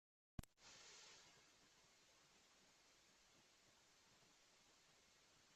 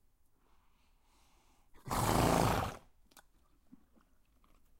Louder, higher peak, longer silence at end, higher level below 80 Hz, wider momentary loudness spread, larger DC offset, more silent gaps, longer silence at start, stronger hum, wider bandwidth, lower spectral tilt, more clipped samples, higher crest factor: second, -63 LUFS vs -33 LUFS; second, -36 dBFS vs -14 dBFS; second, 0 s vs 2 s; second, -74 dBFS vs -50 dBFS; second, 5 LU vs 22 LU; neither; neither; second, 0.4 s vs 1.85 s; neither; second, 13 kHz vs 16 kHz; second, -3 dB/octave vs -5 dB/octave; neither; first, 32 dB vs 24 dB